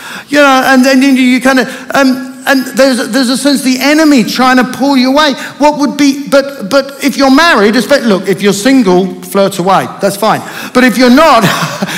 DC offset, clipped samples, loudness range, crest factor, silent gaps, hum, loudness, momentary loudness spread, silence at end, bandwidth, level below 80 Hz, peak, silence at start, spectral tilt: under 0.1%; 2%; 1 LU; 8 dB; none; none; -8 LUFS; 7 LU; 0 s; 16.5 kHz; -46 dBFS; 0 dBFS; 0 s; -4 dB/octave